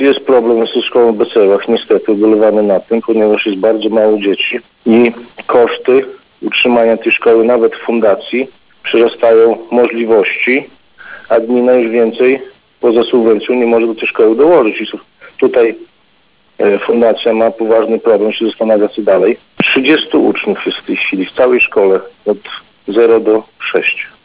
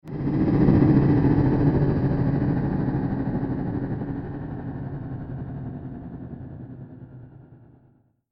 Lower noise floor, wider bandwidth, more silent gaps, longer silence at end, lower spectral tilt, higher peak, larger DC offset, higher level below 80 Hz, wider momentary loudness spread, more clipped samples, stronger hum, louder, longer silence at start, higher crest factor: second, -53 dBFS vs -60 dBFS; second, 4 kHz vs 5.4 kHz; neither; second, 0.2 s vs 0.75 s; second, -9 dB/octave vs -12 dB/octave; first, 0 dBFS vs -6 dBFS; first, 0.2% vs under 0.1%; second, -56 dBFS vs -38 dBFS; second, 7 LU vs 20 LU; neither; neither; first, -11 LUFS vs -23 LUFS; about the same, 0 s vs 0.05 s; second, 10 dB vs 18 dB